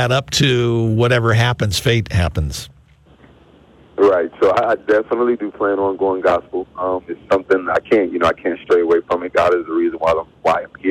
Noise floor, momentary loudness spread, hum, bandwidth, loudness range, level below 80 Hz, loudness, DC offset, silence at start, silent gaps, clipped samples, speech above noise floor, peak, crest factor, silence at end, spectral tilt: -48 dBFS; 7 LU; none; 15.5 kHz; 2 LU; -38 dBFS; -17 LUFS; under 0.1%; 0 s; none; under 0.1%; 31 dB; 0 dBFS; 16 dB; 0 s; -5.5 dB/octave